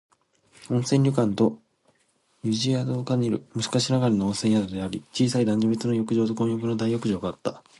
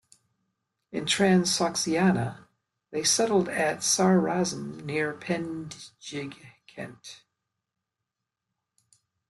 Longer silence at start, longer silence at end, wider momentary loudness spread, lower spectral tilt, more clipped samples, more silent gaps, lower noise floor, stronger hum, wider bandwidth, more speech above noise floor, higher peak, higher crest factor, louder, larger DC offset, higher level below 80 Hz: second, 0.6 s vs 0.9 s; second, 0.2 s vs 2.15 s; second, 7 LU vs 19 LU; first, -6 dB/octave vs -4 dB/octave; neither; neither; second, -67 dBFS vs -86 dBFS; neither; about the same, 11.5 kHz vs 12.5 kHz; second, 43 dB vs 60 dB; about the same, -8 dBFS vs -10 dBFS; about the same, 16 dB vs 20 dB; about the same, -25 LUFS vs -26 LUFS; neither; first, -58 dBFS vs -66 dBFS